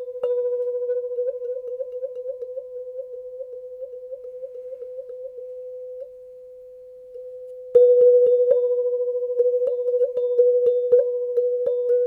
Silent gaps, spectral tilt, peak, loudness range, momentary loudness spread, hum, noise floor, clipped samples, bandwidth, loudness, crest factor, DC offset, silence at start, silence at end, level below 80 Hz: none; -6.5 dB/octave; -4 dBFS; 17 LU; 21 LU; none; -42 dBFS; under 0.1%; 1.7 kHz; -21 LUFS; 18 dB; under 0.1%; 0 s; 0 s; -72 dBFS